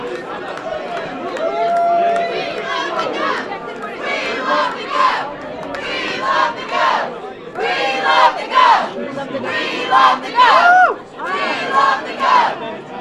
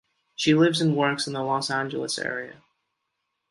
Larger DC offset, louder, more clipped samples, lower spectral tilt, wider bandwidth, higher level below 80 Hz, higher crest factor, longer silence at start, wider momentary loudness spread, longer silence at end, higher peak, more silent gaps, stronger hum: neither; first, -16 LUFS vs -24 LUFS; neither; second, -3 dB/octave vs -4.5 dB/octave; about the same, 11.5 kHz vs 11.5 kHz; first, -56 dBFS vs -70 dBFS; about the same, 16 dB vs 18 dB; second, 0 s vs 0.4 s; about the same, 14 LU vs 13 LU; second, 0 s vs 1 s; first, 0 dBFS vs -8 dBFS; neither; neither